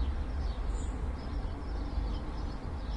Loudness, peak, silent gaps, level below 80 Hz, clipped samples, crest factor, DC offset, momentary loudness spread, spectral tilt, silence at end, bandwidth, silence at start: -38 LUFS; -22 dBFS; none; -36 dBFS; under 0.1%; 12 dB; under 0.1%; 3 LU; -7 dB/octave; 0 s; 9.2 kHz; 0 s